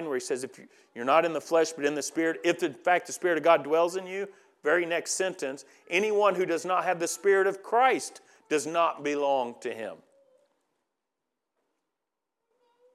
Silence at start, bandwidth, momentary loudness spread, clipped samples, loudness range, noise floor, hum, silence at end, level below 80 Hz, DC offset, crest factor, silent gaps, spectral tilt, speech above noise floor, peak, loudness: 0 s; 14.5 kHz; 13 LU; under 0.1%; 6 LU; -86 dBFS; none; 3 s; under -90 dBFS; under 0.1%; 20 dB; none; -3 dB/octave; 59 dB; -8 dBFS; -27 LUFS